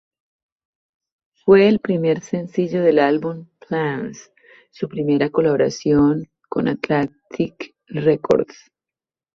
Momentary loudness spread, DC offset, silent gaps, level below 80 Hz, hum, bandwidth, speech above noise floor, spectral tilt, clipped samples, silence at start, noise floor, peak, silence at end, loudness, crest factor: 13 LU; under 0.1%; none; -54 dBFS; none; 7.4 kHz; 71 dB; -7 dB/octave; under 0.1%; 1.45 s; -90 dBFS; -2 dBFS; 0.9 s; -19 LUFS; 18 dB